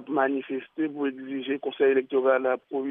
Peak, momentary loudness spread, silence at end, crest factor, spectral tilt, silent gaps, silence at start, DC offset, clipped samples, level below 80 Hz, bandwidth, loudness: -10 dBFS; 8 LU; 0 s; 16 dB; -8.5 dB/octave; none; 0 s; under 0.1%; under 0.1%; -82 dBFS; 3.8 kHz; -26 LUFS